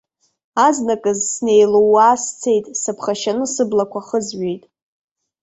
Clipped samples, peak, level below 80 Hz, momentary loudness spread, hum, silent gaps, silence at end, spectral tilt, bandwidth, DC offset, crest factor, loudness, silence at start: under 0.1%; -2 dBFS; -62 dBFS; 11 LU; none; none; 0.85 s; -3.5 dB/octave; 8.2 kHz; under 0.1%; 16 dB; -17 LUFS; 0.55 s